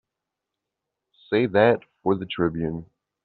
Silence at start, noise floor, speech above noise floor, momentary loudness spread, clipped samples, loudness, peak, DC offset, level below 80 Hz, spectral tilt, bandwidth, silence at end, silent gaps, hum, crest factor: 1.3 s; -85 dBFS; 63 dB; 11 LU; under 0.1%; -23 LUFS; -4 dBFS; under 0.1%; -56 dBFS; -5 dB/octave; 4.6 kHz; 0.4 s; none; none; 22 dB